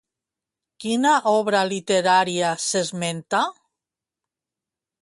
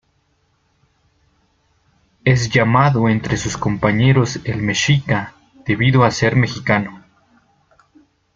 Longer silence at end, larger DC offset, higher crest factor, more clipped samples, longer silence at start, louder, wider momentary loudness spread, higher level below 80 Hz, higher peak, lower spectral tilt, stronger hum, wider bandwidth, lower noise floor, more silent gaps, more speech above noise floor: about the same, 1.5 s vs 1.4 s; neither; about the same, 18 dB vs 18 dB; neither; second, 0.8 s vs 2.25 s; second, -21 LUFS vs -16 LUFS; about the same, 8 LU vs 8 LU; second, -70 dBFS vs -44 dBFS; second, -6 dBFS vs -2 dBFS; second, -3.5 dB/octave vs -5.5 dB/octave; neither; first, 11.5 kHz vs 7.6 kHz; first, -88 dBFS vs -63 dBFS; neither; first, 67 dB vs 47 dB